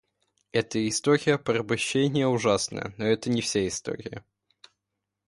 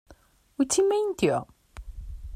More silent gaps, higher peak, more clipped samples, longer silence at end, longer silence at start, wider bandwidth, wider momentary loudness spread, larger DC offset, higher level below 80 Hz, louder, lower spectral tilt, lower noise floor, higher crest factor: neither; about the same, -8 dBFS vs -10 dBFS; neither; first, 1.05 s vs 0 s; first, 0.55 s vs 0.1 s; second, 11.5 kHz vs 16 kHz; second, 10 LU vs 23 LU; neither; second, -60 dBFS vs -44 dBFS; about the same, -26 LUFS vs -25 LUFS; about the same, -4.5 dB/octave vs -4.5 dB/octave; first, -84 dBFS vs -57 dBFS; about the same, 20 dB vs 18 dB